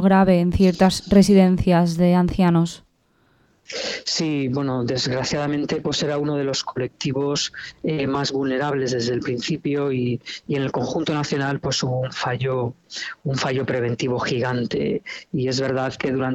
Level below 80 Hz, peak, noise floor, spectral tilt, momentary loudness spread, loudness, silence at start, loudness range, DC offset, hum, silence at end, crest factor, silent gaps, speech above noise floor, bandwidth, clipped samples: -44 dBFS; -2 dBFS; -62 dBFS; -5.5 dB/octave; 10 LU; -21 LUFS; 0 s; 6 LU; under 0.1%; none; 0 s; 20 dB; none; 41 dB; 12.5 kHz; under 0.1%